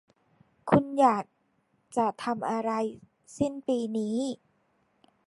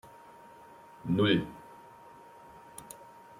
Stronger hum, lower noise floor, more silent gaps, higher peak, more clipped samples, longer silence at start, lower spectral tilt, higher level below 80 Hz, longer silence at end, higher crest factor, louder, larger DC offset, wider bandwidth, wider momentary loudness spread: neither; first, -71 dBFS vs -53 dBFS; neither; first, -6 dBFS vs -12 dBFS; neither; first, 0.65 s vs 0.05 s; about the same, -6.5 dB/octave vs -6 dB/octave; about the same, -64 dBFS vs -66 dBFS; first, 0.95 s vs 0.45 s; about the same, 24 dB vs 24 dB; about the same, -28 LUFS vs -30 LUFS; neither; second, 11.5 kHz vs 16 kHz; second, 12 LU vs 26 LU